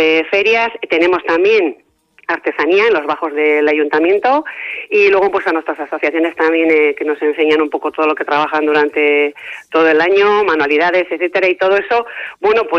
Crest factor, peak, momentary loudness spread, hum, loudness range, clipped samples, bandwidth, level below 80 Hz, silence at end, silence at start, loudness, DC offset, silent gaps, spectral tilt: 12 dB; 0 dBFS; 7 LU; none; 2 LU; under 0.1%; 6.8 kHz; -58 dBFS; 0 s; 0 s; -13 LUFS; under 0.1%; none; -4.5 dB/octave